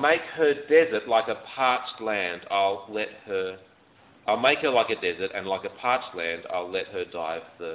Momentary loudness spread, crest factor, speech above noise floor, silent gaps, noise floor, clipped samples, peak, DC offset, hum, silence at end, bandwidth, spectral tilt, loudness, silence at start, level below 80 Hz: 11 LU; 20 dB; 31 dB; none; -57 dBFS; under 0.1%; -6 dBFS; under 0.1%; none; 0 s; 4 kHz; -7.5 dB/octave; -26 LUFS; 0 s; -64 dBFS